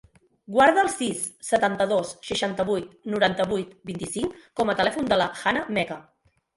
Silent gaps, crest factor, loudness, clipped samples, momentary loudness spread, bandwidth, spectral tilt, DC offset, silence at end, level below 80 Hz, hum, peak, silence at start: none; 20 dB; -24 LUFS; under 0.1%; 12 LU; 12 kHz; -4 dB/octave; under 0.1%; 0.55 s; -58 dBFS; none; -6 dBFS; 0.5 s